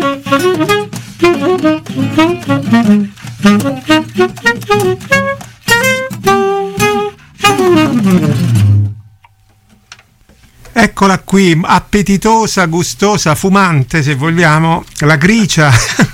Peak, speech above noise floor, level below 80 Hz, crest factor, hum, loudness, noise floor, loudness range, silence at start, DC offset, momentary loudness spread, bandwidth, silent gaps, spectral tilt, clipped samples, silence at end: 0 dBFS; 38 dB; -36 dBFS; 10 dB; none; -10 LUFS; -47 dBFS; 3 LU; 0 s; under 0.1%; 5 LU; 16.5 kHz; none; -5 dB/octave; under 0.1%; 0 s